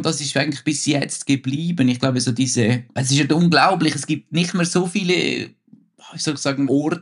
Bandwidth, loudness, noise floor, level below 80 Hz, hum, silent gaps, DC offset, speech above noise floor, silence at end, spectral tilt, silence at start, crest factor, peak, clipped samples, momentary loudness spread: 11.5 kHz; -19 LUFS; -49 dBFS; -64 dBFS; none; none; under 0.1%; 30 dB; 0 s; -4.5 dB/octave; 0 s; 18 dB; -2 dBFS; under 0.1%; 7 LU